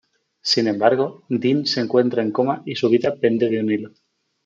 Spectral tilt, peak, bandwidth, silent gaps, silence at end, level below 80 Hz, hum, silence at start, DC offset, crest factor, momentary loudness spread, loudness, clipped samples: -5.5 dB/octave; -2 dBFS; 7.6 kHz; none; 0.6 s; -68 dBFS; none; 0.45 s; under 0.1%; 18 dB; 6 LU; -20 LUFS; under 0.1%